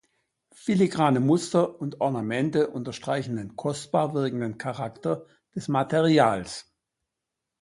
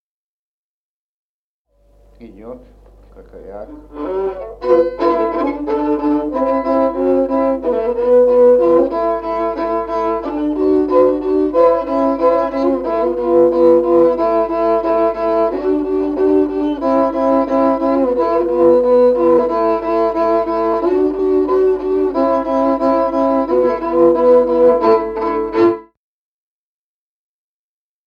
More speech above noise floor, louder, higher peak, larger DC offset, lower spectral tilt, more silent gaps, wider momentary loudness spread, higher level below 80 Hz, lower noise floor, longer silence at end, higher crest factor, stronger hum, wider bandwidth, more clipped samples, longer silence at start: second, 60 dB vs over 70 dB; second, -26 LUFS vs -15 LUFS; about the same, -4 dBFS vs -2 dBFS; neither; second, -6.5 dB/octave vs -8 dB/octave; neither; first, 12 LU vs 8 LU; second, -64 dBFS vs -44 dBFS; second, -85 dBFS vs under -90 dBFS; second, 1 s vs 2.25 s; first, 22 dB vs 14 dB; second, none vs 50 Hz at -45 dBFS; first, 11.5 kHz vs 5.6 kHz; neither; second, 0.65 s vs 2.2 s